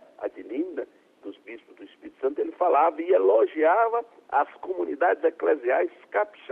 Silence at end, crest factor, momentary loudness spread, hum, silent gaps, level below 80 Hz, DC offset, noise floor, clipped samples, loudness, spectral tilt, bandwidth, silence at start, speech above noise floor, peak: 0.25 s; 16 dB; 22 LU; none; none; -76 dBFS; under 0.1%; -48 dBFS; under 0.1%; -24 LUFS; -6 dB/octave; 3.9 kHz; 0.2 s; 24 dB; -10 dBFS